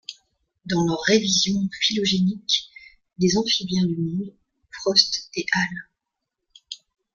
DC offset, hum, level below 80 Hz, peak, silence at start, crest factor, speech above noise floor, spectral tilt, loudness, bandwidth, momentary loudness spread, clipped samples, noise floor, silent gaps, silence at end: under 0.1%; none; -58 dBFS; -2 dBFS; 0.1 s; 22 dB; 60 dB; -3.5 dB/octave; -21 LUFS; 7.4 kHz; 21 LU; under 0.1%; -82 dBFS; none; 0.4 s